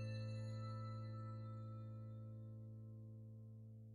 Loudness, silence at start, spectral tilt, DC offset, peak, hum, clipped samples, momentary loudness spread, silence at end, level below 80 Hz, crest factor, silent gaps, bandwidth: -52 LUFS; 0 s; -8 dB/octave; under 0.1%; -40 dBFS; none; under 0.1%; 9 LU; 0 s; -76 dBFS; 12 dB; none; 7.2 kHz